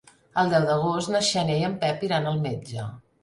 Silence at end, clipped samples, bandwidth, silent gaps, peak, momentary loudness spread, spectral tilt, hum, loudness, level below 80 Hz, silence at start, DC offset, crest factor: 0.25 s; under 0.1%; 11.5 kHz; none; -10 dBFS; 11 LU; -5 dB/octave; none; -25 LUFS; -60 dBFS; 0.35 s; under 0.1%; 16 dB